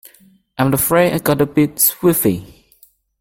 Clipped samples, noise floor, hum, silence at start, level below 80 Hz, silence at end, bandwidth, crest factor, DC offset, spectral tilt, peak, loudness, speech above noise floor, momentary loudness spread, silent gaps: under 0.1%; -52 dBFS; none; 0.6 s; -48 dBFS; 0.75 s; 17 kHz; 16 dB; under 0.1%; -5 dB/octave; 0 dBFS; -15 LUFS; 37 dB; 7 LU; none